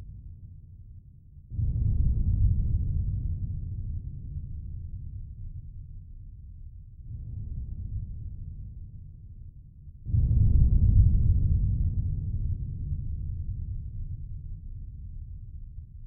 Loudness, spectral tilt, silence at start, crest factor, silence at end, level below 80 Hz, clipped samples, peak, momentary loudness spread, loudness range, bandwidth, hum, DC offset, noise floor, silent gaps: -30 LUFS; -19.5 dB/octave; 0 s; 20 dB; 0 s; -30 dBFS; under 0.1%; -10 dBFS; 24 LU; 15 LU; 0.8 kHz; none; under 0.1%; -50 dBFS; none